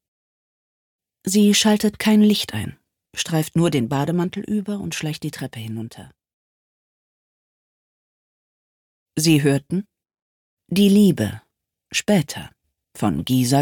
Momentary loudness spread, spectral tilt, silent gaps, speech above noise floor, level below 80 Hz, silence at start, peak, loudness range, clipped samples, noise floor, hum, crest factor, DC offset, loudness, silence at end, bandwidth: 16 LU; -5 dB/octave; 6.33-9.06 s, 10.22-10.57 s; over 71 dB; -56 dBFS; 1.25 s; -4 dBFS; 13 LU; under 0.1%; under -90 dBFS; none; 18 dB; under 0.1%; -20 LUFS; 0 s; 18.5 kHz